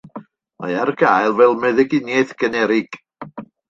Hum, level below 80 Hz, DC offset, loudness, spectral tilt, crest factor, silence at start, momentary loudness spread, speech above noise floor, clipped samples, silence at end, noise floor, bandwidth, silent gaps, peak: none; -62 dBFS; under 0.1%; -17 LUFS; -6 dB/octave; 16 dB; 0.15 s; 21 LU; 22 dB; under 0.1%; 0.25 s; -38 dBFS; 7.4 kHz; none; -2 dBFS